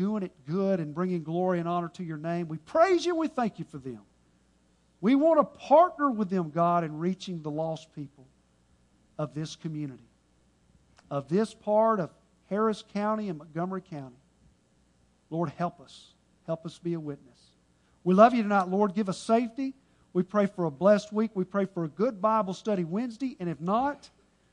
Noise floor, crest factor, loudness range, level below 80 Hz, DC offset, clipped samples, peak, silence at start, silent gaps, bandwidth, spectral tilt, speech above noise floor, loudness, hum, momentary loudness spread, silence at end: -66 dBFS; 24 dB; 11 LU; -70 dBFS; under 0.1%; under 0.1%; -4 dBFS; 0 s; none; 10.5 kHz; -7.5 dB/octave; 38 dB; -28 LUFS; none; 15 LU; 0.45 s